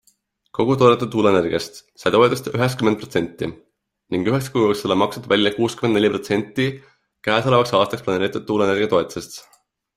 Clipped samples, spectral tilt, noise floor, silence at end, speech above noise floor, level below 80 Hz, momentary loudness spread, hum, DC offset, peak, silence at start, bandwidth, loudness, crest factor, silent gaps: under 0.1%; -5.5 dB/octave; -62 dBFS; 0.55 s; 43 dB; -56 dBFS; 12 LU; none; under 0.1%; -2 dBFS; 0.55 s; 16 kHz; -19 LUFS; 18 dB; none